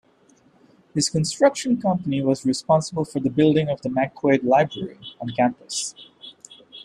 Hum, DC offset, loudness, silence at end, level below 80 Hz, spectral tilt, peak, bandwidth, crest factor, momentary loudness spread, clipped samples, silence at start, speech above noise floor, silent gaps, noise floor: none; under 0.1%; -22 LUFS; 0.05 s; -60 dBFS; -5 dB/octave; -4 dBFS; 13 kHz; 18 dB; 15 LU; under 0.1%; 0.95 s; 36 dB; none; -57 dBFS